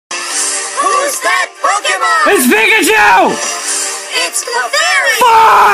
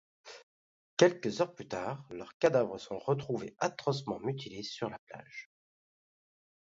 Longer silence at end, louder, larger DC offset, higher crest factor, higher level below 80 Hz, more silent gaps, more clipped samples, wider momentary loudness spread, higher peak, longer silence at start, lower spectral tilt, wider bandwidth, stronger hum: second, 0 s vs 1.2 s; first, -10 LUFS vs -33 LUFS; neither; second, 10 dB vs 24 dB; first, -50 dBFS vs -72 dBFS; second, none vs 0.43-0.97 s, 2.34-2.40 s, 4.99-5.07 s; neither; second, 8 LU vs 21 LU; first, 0 dBFS vs -10 dBFS; second, 0.1 s vs 0.25 s; second, -0.5 dB/octave vs -5.5 dB/octave; first, 16 kHz vs 7.8 kHz; neither